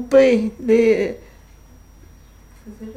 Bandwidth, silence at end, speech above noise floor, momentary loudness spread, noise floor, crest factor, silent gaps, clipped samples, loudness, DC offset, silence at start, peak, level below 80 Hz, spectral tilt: 11 kHz; 0.05 s; 29 dB; 21 LU; -46 dBFS; 16 dB; none; under 0.1%; -17 LUFS; under 0.1%; 0 s; -4 dBFS; -46 dBFS; -6 dB/octave